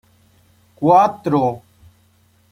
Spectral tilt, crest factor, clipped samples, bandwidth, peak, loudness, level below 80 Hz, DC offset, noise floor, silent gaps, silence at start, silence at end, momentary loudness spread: -8 dB/octave; 18 dB; under 0.1%; 13 kHz; -2 dBFS; -16 LUFS; -58 dBFS; under 0.1%; -56 dBFS; none; 0.8 s; 0.95 s; 9 LU